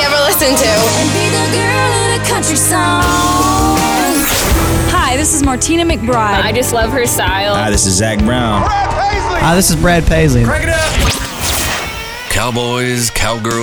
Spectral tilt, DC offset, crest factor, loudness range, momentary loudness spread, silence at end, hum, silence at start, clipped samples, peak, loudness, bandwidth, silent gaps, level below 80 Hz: -3.5 dB/octave; under 0.1%; 12 dB; 2 LU; 5 LU; 0 s; none; 0 s; under 0.1%; 0 dBFS; -12 LUFS; over 20 kHz; none; -22 dBFS